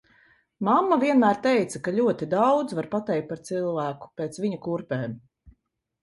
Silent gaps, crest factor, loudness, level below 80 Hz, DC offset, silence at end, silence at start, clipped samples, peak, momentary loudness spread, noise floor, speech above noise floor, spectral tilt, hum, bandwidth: none; 18 dB; -25 LUFS; -64 dBFS; under 0.1%; 0.55 s; 0.6 s; under 0.1%; -8 dBFS; 11 LU; -69 dBFS; 45 dB; -6.5 dB/octave; none; 11.5 kHz